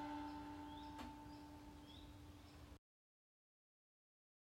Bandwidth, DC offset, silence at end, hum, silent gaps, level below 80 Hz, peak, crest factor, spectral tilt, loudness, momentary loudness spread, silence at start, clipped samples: 16 kHz; under 0.1%; 1.65 s; none; none; -68 dBFS; -40 dBFS; 18 dB; -5.5 dB/octave; -56 LUFS; 11 LU; 0 s; under 0.1%